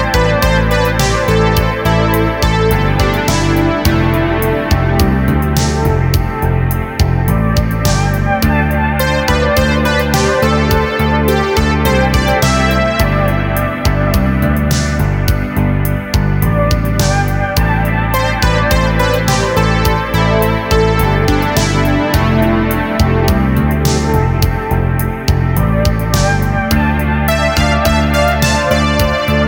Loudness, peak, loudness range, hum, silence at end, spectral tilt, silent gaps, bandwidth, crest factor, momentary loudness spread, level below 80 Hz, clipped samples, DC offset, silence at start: -13 LUFS; 0 dBFS; 2 LU; none; 0 s; -5.5 dB/octave; none; 20 kHz; 12 dB; 3 LU; -20 dBFS; under 0.1%; under 0.1%; 0 s